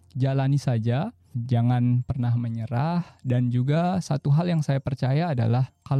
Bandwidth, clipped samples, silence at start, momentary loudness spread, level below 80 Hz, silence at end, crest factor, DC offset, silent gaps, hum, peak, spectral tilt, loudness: 9.4 kHz; under 0.1%; 0.15 s; 5 LU; -54 dBFS; 0 s; 10 dB; under 0.1%; none; none; -12 dBFS; -8.5 dB/octave; -25 LUFS